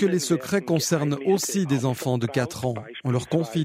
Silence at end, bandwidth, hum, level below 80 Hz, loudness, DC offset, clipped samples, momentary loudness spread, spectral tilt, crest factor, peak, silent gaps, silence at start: 0 s; 16 kHz; none; -60 dBFS; -24 LUFS; under 0.1%; under 0.1%; 5 LU; -5.5 dB/octave; 16 dB; -8 dBFS; none; 0 s